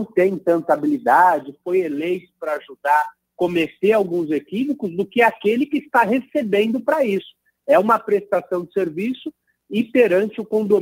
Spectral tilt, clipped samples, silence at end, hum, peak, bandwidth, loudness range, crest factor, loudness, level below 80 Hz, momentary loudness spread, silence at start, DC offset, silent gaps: -6.5 dB/octave; under 0.1%; 0 s; none; -2 dBFS; 16 kHz; 2 LU; 18 dB; -19 LUFS; -68 dBFS; 10 LU; 0 s; under 0.1%; none